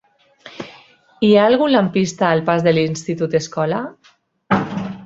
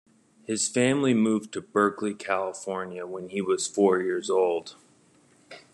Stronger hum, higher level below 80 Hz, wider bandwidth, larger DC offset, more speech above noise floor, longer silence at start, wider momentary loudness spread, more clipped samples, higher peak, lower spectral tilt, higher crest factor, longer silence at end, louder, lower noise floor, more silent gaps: neither; first, -56 dBFS vs -76 dBFS; second, 8 kHz vs 12 kHz; neither; first, 40 dB vs 34 dB; about the same, 0.45 s vs 0.5 s; first, 20 LU vs 11 LU; neither; first, 0 dBFS vs -8 dBFS; first, -6 dB/octave vs -4.5 dB/octave; about the same, 18 dB vs 18 dB; second, 0 s vs 0.15 s; first, -17 LUFS vs -26 LUFS; second, -55 dBFS vs -60 dBFS; neither